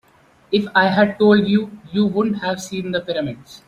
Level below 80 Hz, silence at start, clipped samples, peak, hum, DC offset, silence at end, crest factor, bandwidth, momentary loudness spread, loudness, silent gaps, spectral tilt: -56 dBFS; 0.5 s; under 0.1%; -2 dBFS; none; under 0.1%; 0.1 s; 16 dB; 11.5 kHz; 11 LU; -18 LUFS; none; -6 dB/octave